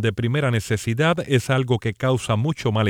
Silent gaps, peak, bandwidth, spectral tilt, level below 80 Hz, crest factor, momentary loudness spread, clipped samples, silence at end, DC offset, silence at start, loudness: none; -6 dBFS; 15.5 kHz; -6 dB/octave; -50 dBFS; 14 dB; 3 LU; under 0.1%; 0 s; under 0.1%; 0 s; -21 LUFS